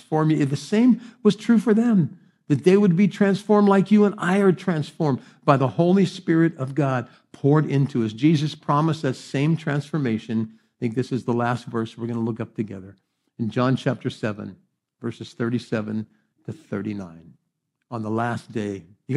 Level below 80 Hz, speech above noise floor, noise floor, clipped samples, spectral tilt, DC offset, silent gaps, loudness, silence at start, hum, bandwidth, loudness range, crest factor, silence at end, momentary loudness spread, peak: -70 dBFS; 55 dB; -76 dBFS; under 0.1%; -7.5 dB/octave; under 0.1%; none; -22 LUFS; 0.1 s; none; 11.5 kHz; 11 LU; 20 dB; 0 s; 14 LU; -2 dBFS